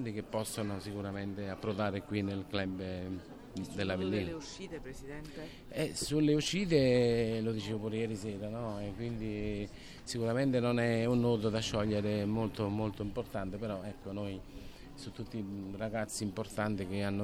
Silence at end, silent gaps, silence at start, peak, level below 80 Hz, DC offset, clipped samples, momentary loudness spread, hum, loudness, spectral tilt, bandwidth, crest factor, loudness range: 0 s; none; 0 s; -16 dBFS; -54 dBFS; under 0.1%; under 0.1%; 15 LU; none; -35 LUFS; -6 dB/octave; 16 kHz; 18 dB; 8 LU